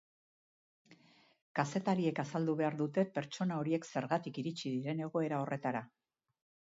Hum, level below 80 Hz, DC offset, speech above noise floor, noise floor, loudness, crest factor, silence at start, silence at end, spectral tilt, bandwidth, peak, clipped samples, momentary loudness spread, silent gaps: none; -82 dBFS; under 0.1%; 30 dB; -66 dBFS; -37 LUFS; 20 dB; 0.9 s; 0.8 s; -6 dB/octave; 7.6 kHz; -18 dBFS; under 0.1%; 5 LU; 1.42-1.55 s